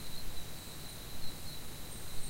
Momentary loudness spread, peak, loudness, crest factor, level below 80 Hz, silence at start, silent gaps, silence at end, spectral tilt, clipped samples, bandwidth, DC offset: 1 LU; -24 dBFS; -45 LUFS; 12 dB; -50 dBFS; 0 s; none; 0 s; -3 dB/octave; under 0.1%; 16 kHz; under 0.1%